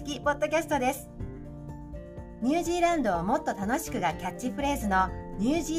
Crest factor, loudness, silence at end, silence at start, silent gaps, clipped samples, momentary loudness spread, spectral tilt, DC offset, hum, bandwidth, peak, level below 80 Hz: 16 dB; -28 LUFS; 0 s; 0 s; none; under 0.1%; 16 LU; -5 dB/octave; under 0.1%; none; 15.5 kHz; -12 dBFS; -44 dBFS